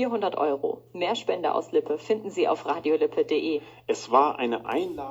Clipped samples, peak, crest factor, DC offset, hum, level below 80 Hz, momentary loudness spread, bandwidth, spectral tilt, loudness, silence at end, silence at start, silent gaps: under 0.1%; -6 dBFS; 20 dB; under 0.1%; none; -68 dBFS; 8 LU; 8 kHz; -4.5 dB/octave; -26 LUFS; 0 s; 0 s; none